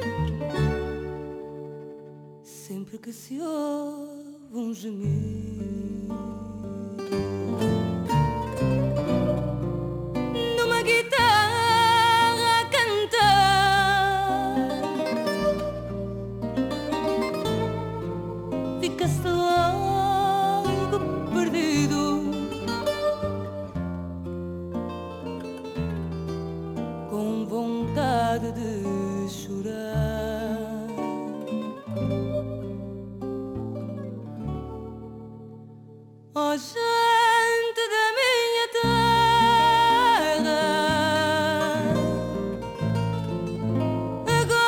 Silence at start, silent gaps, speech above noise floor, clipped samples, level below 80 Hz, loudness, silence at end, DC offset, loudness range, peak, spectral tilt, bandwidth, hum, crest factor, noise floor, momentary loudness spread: 0 s; none; 16 dB; under 0.1%; -46 dBFS; -25 LUFS; 0 s; under 0.1%; 13 LU; -10 dBFS; -5 dB/octave; 19 kHz; none; 16 dB; -47 dBFS; 16 LU